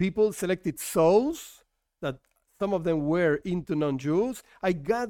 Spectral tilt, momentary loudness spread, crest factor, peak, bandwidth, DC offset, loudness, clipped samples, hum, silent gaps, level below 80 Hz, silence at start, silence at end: -6 dB/octave; 13 LU; 16 dB; -10 dBFS; 17 kHz; under 0.1%; -27 LUFS; under 0.1%; none; none; -56 dBFS; 0 s; 0 s